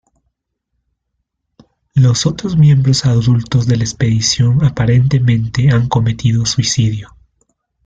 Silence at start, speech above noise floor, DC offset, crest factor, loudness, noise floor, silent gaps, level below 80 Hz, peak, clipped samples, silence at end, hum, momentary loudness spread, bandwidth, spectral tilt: 1.95 s; 60 dB; under 0.1%; 12 dB; -13 LUFS; -72 dBFS; none; -38 dBFS; -2 dBFS; under 0.1%; 0.8 s; none; 4 LU; 9.2 kHz; -5.5 dB/octave